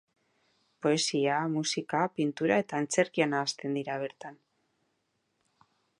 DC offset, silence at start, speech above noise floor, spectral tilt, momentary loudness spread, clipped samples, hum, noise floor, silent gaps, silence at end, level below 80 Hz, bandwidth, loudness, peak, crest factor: under 0.1%; 0.8 s; 48 dB; -4 dB/octave; 9 LU; under 0.1%; none; -78 dBFS; none; 1.65 s; -80 dBFS; 11.5 kHz; -30 LUFS; -10 dBFS; 22 dB